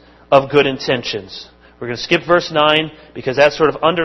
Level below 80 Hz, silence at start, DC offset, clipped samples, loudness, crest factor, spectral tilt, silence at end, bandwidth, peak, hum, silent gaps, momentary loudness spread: -48 dBFS; 0.3 s; under 0.1%; under 0.1%; -15 LUFS; 16 dB; -5 dB/octave; 0 s; 8 kHz; 0 dBFS; none; none; 14 LU